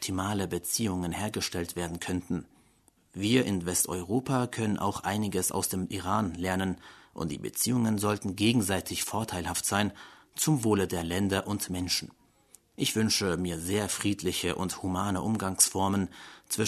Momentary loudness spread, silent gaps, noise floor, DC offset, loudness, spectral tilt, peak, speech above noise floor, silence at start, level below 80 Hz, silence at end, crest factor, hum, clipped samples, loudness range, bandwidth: 9 LU; none; -65 dBFS; under 0.1%; -29 LUFS; -4 dB/octave; -6 dBFS; 35 dB; 0 s; -56 dBFS; 0 s; 24 dB; none; under 0.1%; 2 LU; 13.5 kHz